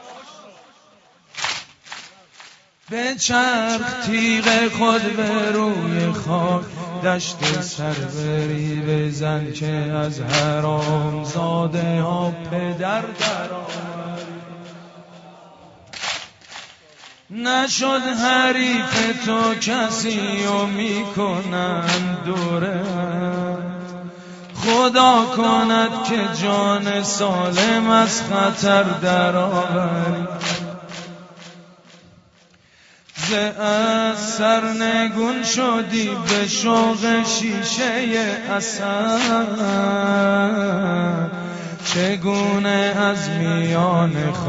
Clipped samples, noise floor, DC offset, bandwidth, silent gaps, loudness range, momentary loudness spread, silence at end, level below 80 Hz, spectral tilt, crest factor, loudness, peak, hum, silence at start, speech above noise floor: under 0.1%; -54 dBFS; under 0.1%; 8 kHz; none; 8 LU; 13 LU; 0 s; -56 dBFS; -4.5 dB/octave; 20 dB; -19 LUFS; 0 dBFS; none; 0 s; 34 dB